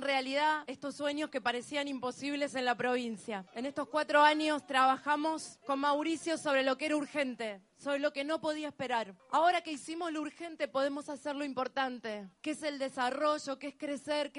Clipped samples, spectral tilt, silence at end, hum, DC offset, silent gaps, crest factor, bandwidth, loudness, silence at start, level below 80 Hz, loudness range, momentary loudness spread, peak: under 0.1%; -3 dB/octave; 0 s; none; under 0.1%; none; 22 dB; 11.5 kHz; -34 LUFS; 0 s; -80 dBFS; 5 LU; 12 LU; -12 dBFS